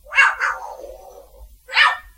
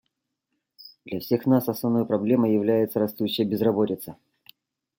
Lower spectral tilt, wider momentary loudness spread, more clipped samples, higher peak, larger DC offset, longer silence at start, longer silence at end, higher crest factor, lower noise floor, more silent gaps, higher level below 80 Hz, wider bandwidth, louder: second, 1 dB/octave vs -7 dB/octave; first, 22 LU vs 11 LU; neither; first, 0 dBFS vs -8 dBFS; neither; second, 0.1 s vs 0.8 s; second, 0.15 s vs 0.85 s; about the same, 20 dB vs 16 dB; second, -44 dBFS vs -80 dBFS; neither; first, -50 dBFS vs -68 dBFS; about the same, 16 kHz vs 17 kHz; first, -16 LUFS vs -24 LUFS